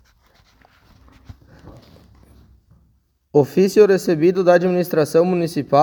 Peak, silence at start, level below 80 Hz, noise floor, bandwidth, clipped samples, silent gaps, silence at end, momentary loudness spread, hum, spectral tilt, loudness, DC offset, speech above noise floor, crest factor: 0 dBFS; 1.65 s; -54 dBFS; -61 dBFS; 19 kHz; under 0.1%; none; 0 s; 5 LU; none; -6.5 dB/octave; -16 LUFS; under 0.1%; 46 dB; 18 dB